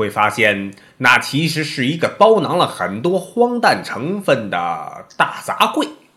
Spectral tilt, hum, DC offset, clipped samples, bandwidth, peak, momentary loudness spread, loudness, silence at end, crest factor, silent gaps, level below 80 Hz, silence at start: -4.5 dB/octave; none; under 0.1%; 0.1%; 16.5 kHz; 0 dBFS; 10 LU; -16 LUFS; 0.2 s; 18 dB; none; -62 dBFS; 0 s